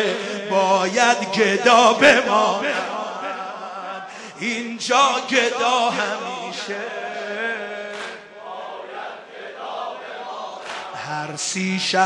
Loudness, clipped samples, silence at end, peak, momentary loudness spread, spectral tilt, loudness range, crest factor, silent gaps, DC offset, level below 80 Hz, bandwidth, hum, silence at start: -20 LUFS; under 0.1%; 0 s; -2 dBFS; 19 LU; -2.5 dB/octave; 14 LU; 20 dB; none; under 0.1%; -68 dBFS; 11.5 kHz; none; 0 s